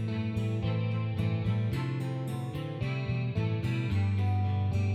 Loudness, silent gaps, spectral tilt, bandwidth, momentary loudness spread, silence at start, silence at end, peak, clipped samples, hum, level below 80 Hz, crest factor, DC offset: -31 LUFS; none; -8 dB/octave; 9.4 kHz; 5 LU; 0 s; 0 s; -18 dBFS; under 0.1%; none; -52 dBFS; 12 dB; under 0.1%